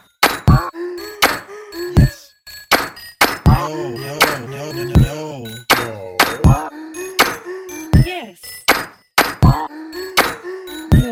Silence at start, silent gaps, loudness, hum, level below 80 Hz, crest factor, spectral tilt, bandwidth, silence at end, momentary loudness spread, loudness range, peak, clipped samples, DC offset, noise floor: 0.2 s; none; -16 LUFS; none; -26 dBFS; 16 dB; -5 dB/octave; 17 kHz; 0 s; 15 LU; 0 LU; 0 dBFS; under 0.1%; under 0.1%; -39 dBFS